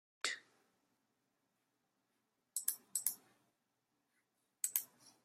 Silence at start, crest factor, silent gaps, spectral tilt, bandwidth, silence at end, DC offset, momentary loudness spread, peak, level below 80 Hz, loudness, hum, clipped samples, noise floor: 0.25 s; 32 dB; none; 3 dB/octave; 16 kHz; 0.15 s; under 0.1%; 12 LU; -16 dBFS; under -90 dBFS; -41 LUFS; none; under 0.1%; -85 dBFS